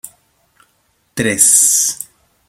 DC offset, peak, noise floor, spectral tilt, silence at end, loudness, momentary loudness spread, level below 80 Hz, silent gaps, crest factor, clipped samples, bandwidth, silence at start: under 0.1%; 0 dBFS; -61 dBFS; -1 dB/octave; 0.45 s; -10 LUFS; 21 LU; -54 dBFS; none; 18 dB; under 0.1%; over 20 kHz; 0.05 s